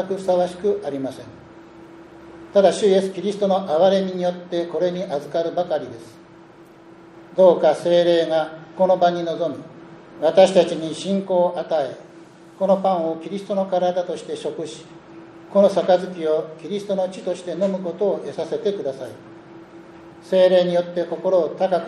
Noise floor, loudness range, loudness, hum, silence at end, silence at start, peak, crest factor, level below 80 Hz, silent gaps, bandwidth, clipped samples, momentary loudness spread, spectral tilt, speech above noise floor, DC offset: -46 dBFS; 5 LU; -20 LUFS; none; 0 s; 0 s; -2 dBFS; 20 dB; -66 dBFS; none; 11 kHz; under 0.1%; 14 LU; -6 dB/octave; 26 dB; under 0.1%